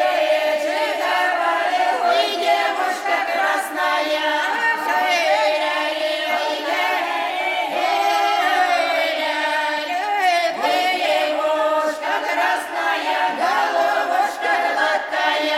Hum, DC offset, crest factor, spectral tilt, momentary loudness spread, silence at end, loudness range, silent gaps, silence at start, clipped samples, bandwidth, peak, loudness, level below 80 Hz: none; under 0.1%; 14 dB; -0.5 dB/octave; 4 LU; 0 s; 1 LU; none; 0 s; under 0.1%; 16.5 kHz; -6 dBFS; -19 LUFS; -68 dBFS